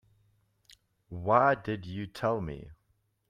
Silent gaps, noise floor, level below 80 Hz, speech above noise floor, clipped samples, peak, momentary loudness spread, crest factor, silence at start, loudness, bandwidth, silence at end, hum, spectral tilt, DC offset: none; -74 dBFS; -58 dBFS; 44 dB; under 0.1%; -10 dBFS; 18 LU; 24 dB; 1.1 s; -30 LUFS; 14.5 kHz; 0.55 s; none; -7.5 dB/octave; under 0.1%